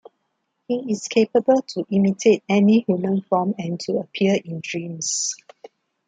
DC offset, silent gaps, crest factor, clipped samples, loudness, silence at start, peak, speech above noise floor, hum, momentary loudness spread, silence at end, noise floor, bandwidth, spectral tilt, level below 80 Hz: under 0.1%; none; 18 dB; under 0.1%; -21 LUFS; 0.7 s; -4 dBFS; 54 dB; none; 10 LU; 0.7 s; -74 dBFS; 9.4 kHz; -5 dB/octave; -66 dBFS